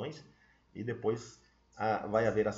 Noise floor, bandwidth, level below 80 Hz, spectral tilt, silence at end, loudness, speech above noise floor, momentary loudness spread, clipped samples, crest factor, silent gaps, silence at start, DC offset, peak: -64 dBFS; 7.8 kHz; -64 dBFS; -5.5 dB/octave; 0 s; -34 LUFS; 32 dB; 22 LU; under 0.1%; 18 dB; none; 0 s; under 0.1%; -16 dBFS